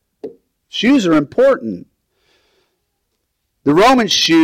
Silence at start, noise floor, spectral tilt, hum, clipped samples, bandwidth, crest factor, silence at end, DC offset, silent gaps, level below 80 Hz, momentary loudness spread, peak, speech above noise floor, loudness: 0.25 s; -70 dBFS; -4 dB/octave; none; under 0.1%; 16 kHz; 12 dB; 0 s; under 0.1%; none; -50 dBFS; 23 LU; -4 dBFS; 58 dB; -13 LUFS